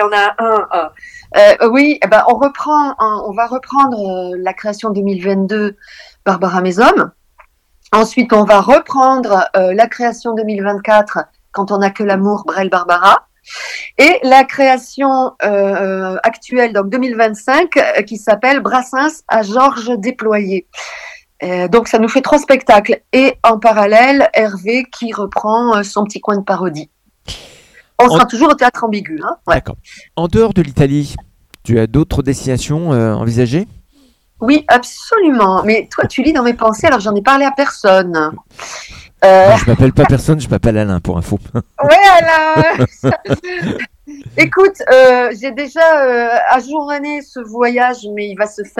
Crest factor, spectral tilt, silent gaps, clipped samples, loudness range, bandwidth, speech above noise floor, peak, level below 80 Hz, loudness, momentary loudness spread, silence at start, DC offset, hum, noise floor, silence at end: 12 dB; -6 dB/octave; none; 0.6%; 5 LU; 16 kHz; 40 dB; 0 dBFS; -36 dBFS; -12 LUFS; 13 LU; 0 s; under 0.1%; none; -51 dBFS; 0.15 s